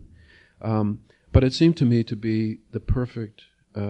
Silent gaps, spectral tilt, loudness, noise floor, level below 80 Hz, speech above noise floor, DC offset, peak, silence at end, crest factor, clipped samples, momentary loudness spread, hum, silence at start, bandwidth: none; -8 dB/octave; -23 LUFS; -53 dBFS; -36 dBFS; 31 dB; under 0.1%; -2 dBFS; 0 s; 22 dB; under 0.1%; 17 LU; none; 0.65 s; 9 kHz